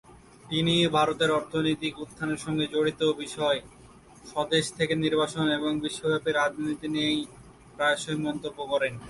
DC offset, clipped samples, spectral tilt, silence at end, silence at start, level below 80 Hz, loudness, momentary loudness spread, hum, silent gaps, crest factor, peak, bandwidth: under 0.1%; under 0.1%; -4.5 dB/octave; 0 s; 0.1 s; -58 dBFS; -27 LUFS; 8 LU; none; none; 18 dB; -10 dBFS; 11.5 kHz